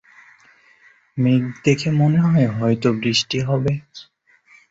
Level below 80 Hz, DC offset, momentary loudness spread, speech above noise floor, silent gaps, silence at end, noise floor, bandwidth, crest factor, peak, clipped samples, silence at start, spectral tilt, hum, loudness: -54 dBFS; under 0.1%; 6 LU; 36 dB; none; 0.7 s; -53 dBFS; 8 kHz; 16 dB; -4 dBFS; under 0.1%; 1.15 s; -6 dB/octave; none; -19 LUFS